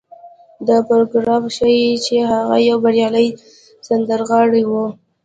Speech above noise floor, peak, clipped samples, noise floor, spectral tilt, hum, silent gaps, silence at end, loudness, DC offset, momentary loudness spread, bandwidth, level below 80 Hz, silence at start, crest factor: 27 dB; -2 dBFS; under 0.1%; -41 dBFS; -5 dB/octave; none; none; 0.3 s; -15 LUFS; under 0.1%; 6 LU; 9 kHz; -56 dBFS; 0.25 s; 14 dB